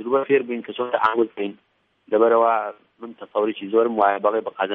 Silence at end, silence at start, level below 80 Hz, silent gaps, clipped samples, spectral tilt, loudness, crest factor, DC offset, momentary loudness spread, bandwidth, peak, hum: 0 s; 0 s; -74 dBFS; none; under 0.1%; -8 dB/octave; -21 LUFS; 18 dB; under 0.1%; 13 LU; 4.3 kHz; -4 dBFS; none